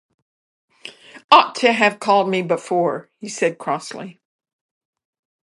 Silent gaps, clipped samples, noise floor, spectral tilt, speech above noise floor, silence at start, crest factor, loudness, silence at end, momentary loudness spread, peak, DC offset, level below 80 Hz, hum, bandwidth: 1.24-1.29 s; under 0.1%; -41 dBFS; -4 dB/octave; 21 dB; 0.85 s; 20 dB; -17 LUFS; 1.35 s; 24 LU; 0 dBFS; under 0.1%; -74 dBFS; none; 11.5 kHz